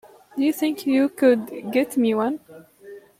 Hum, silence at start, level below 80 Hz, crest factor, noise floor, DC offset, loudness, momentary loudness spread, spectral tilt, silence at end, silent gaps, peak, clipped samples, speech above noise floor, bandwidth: none; 0.35 s; -70 dBFS; 16 dB; -44 dBFS; under 0.1%; -22 LUFS; 8 LU; -5 dB/octave; 0.2 s; none; -6 dBFS; under 0.1%; 24 dB; 16 kHz